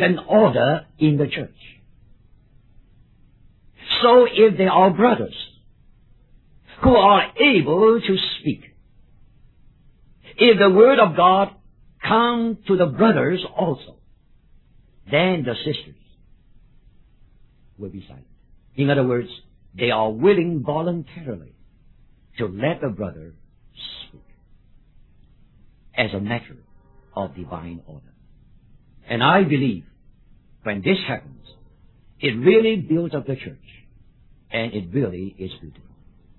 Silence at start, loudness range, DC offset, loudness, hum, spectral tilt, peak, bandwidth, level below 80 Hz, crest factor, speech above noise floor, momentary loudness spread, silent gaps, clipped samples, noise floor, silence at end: 0 s; 13 LU; under 0.1%; -19 LUFS; none; -9.5 dB/octave; -2 dBFS; 4.3 kHz; -48 dBFS; 20 dB; 35 dB; 21 LU; none; under 0.1%; -53 dBFS; 0.7 s